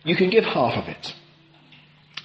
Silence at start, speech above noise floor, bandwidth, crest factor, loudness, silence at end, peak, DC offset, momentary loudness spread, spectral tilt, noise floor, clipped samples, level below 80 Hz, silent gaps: 0.05 s; 32 dB; 8.2 kHz; 20 dB; -21 LUFS; 0.05 s; -4 dBFS; under 0.1%; 20 LU; -6.5 dB/octave; -53 dBFS; under 0.1%; -62 dBFS; none